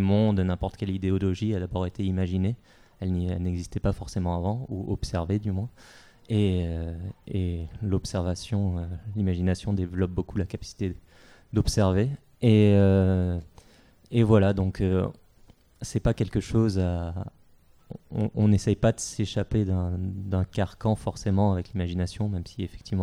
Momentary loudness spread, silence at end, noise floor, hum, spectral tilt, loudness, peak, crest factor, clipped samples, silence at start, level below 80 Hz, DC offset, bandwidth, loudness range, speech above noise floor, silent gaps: 11 LU; 0 s; -57 dBFS; none; -7.5 dB/octave; -27 LUFS; -6 dBFS; 20 dB; under 0.1%; 0 s; -42 dBFS; under 0.1%; 11.5 kHz; 6 LU; 31 dB; none